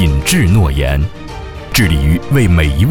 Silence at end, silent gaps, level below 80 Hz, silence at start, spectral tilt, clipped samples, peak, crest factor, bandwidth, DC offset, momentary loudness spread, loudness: 0 s; none; -18 dBFS; 0 s; -5.5 dB/octave; under 0.1%; 0 dBFS; 12 dB; 19.5 kHz; under 0.1%; 14 LU; -13 LUFS